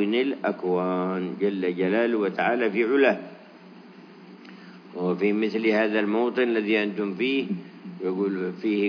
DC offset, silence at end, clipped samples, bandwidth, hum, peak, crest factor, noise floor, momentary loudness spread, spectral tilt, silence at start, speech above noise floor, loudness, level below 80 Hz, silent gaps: under 0.1%; 0 s; under 0.1%; 5.4 kHz; none; -6 dBFS; 18 dB; -47 dBFS; 11 LU; -8 dB/octave; 0 s; 23 dB; -25 LUFS; under -90 dBFS; none